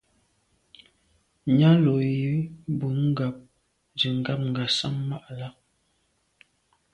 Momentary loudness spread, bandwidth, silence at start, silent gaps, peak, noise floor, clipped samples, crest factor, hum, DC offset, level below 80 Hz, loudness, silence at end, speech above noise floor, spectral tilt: 19 LU; 10 kHz; 1.45 s; none; -8 dBFS; -71 dBFS; under 0.1%; 18 dB; none; under 0.1%; -62 dBFS; -25 LUFS; 1.45 s; 47 dB; -7 dB/octave